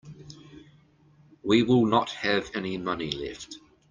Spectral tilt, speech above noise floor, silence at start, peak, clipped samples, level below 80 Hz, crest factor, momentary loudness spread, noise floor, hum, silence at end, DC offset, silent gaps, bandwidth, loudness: -5.5 dB/octave; 33 dB; 0.05 s; -8 dBFS; under 0.1%; -58 dBFS; 20 dB; 25 LU; -59 dBFS; none; 0.35 s; under 0.1%; none; 9.4 kHz; -26 LUFS